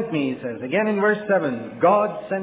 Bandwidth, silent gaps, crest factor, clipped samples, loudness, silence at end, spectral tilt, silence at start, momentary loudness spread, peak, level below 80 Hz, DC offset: 4 kHz; none; 16 dB; under 0.1%; -21 LUFS; 0 s; -10.5 dB/octave; 0 s; 8 LU; -6 dBFS; -64 dBFS; under 0.1%